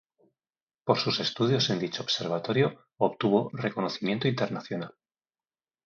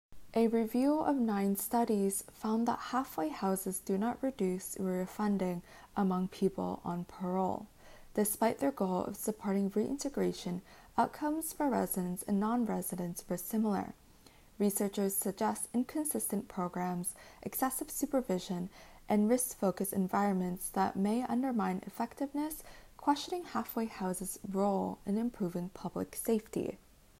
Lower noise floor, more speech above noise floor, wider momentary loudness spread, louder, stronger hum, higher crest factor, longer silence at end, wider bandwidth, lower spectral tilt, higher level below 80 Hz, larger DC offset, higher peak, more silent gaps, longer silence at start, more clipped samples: first, under -90 dBFS vs -60 dBFS; first, over 62 dB vs 26 dB; about the same, 9 LU vs 8 LU; first, -28 LUFS vs -34 LUFS; neither; about the same, 22 dB vs 18 dB; first, 0.95 s vs 0.45 s; second, 7.4 kHz vs 16 kHz; about the same, -5.5 dB/octave vs -5.5 dB/octave; second, -70 dBFS vs -62 dBFS; neither; first, -6 dBFS vs -16 dBFS; neither; first, 0.85 s vs 0.1 s; neither